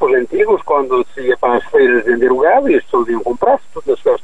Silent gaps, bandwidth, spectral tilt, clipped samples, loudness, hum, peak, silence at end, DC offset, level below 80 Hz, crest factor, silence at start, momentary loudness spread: none; 8 kHz; -6 dB/octave; under 0.1%; -14 LUFS; none; -2 dBFS; 0.05 s; 3%; -46 dBFS; 12 dB; 0 s; 6 LU